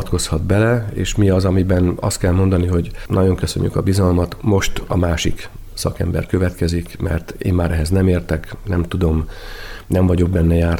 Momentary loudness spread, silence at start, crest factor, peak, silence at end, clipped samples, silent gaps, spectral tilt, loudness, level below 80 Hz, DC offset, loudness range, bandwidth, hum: 8 LU; 0 s; 12 dB; -4 dBFS; 0 s; under 0.1%; none; -6.5 dB/octave; -18 LUFS; -28 dBFS; under 0.1%; 3 LU; 16.5 kHz; none